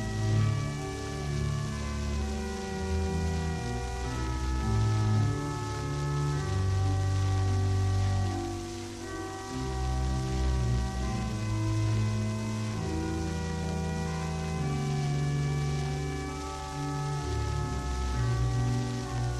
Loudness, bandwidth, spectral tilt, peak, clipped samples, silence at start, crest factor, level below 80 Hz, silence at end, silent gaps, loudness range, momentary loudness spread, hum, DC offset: -31 LUFS; 12.5 kHz; -6 dB/octave; -16 dBFS; under 0.1%; 0 s; 14 dB; -38 dBFS; 0 s; none; 3 LU; 7 LU; none; under 0.1%